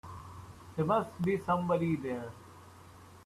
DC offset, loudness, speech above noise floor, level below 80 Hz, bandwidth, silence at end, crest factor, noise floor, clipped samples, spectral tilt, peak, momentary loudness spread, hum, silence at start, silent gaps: under 0.1%; -32 LUFS; 23 dB; -64 dBFS; 13.5 kHz; 0 s; 18 dB; -54 dBFS; under 0.1%; -8 dB/octave; -16 dBFS; 23 LU; none; 0.05 s; none